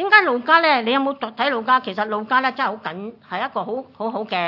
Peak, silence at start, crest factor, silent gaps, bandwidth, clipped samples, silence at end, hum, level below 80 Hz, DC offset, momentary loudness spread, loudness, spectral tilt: 0 dBFS; 0 s; 20 dB; none; 6 kHz; under 0.1%; 0 s; none; -76 dBFS; under 0.1%; 14 LU; -19 LUFS; -6 dB/octave